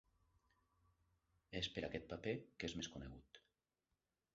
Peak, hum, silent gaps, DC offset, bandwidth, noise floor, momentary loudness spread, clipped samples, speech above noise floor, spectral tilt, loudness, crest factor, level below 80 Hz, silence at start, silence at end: -28 dBFS; none; none; under 0.1%; 7.6 kHz; under -90 dBFS; 17 LU; under 0.1%; over 42 dB; -3.5 dB/octave; -48 LUFS; 24 dB; -68 dBFS; 1.5 s; 0.95 s